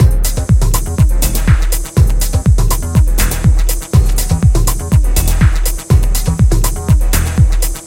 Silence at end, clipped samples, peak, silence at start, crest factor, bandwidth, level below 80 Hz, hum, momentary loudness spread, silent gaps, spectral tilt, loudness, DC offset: 0 s; under 0.1%; 0 dBFS; 0 s; 10 dB; 17 kHz; -12 dBFS; none; 3 LU; none; -5 dB/octave; -13 LUFS; under 0.1%